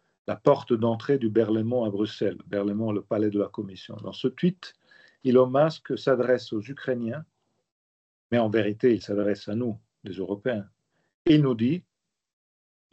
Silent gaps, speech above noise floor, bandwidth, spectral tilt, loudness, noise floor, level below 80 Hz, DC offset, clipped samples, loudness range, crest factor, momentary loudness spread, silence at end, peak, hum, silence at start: 7.72-8.30 s, 11.14-11.25 s; over 65 dB; 8 kHz; -8 dB/octave; -26 LUFS; under -90 dBFS; -68 dBFS; under 0.1%; under 0.1%; 3 LU; 20 dB; 13 LU; 1.1 s; -6 dBFS; none; 0.3 s